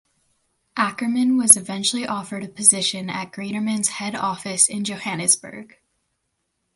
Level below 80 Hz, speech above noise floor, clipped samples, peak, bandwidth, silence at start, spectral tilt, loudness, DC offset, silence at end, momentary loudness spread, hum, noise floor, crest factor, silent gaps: -66 dBFS; 53 dB; under 0.1%; 0 dBFS; 16 kHz; 0.75 s; -2 dB/octave; -19 LUFS; under 0.1%; 1.1 s; 16 LU; none; -75 dBFS; 22 dB; none